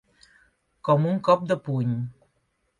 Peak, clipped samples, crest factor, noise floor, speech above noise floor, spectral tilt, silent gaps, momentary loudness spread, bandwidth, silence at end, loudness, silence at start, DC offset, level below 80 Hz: -6 dBFS; under 0.1%; 20 dB; -72 dBFS; 49 dB; -8.5 dB/octave; none; 11 LU; 11 kHz; 0.7 s; -24 LUFS; 0.85 s; under 0.1%; -66 dBFS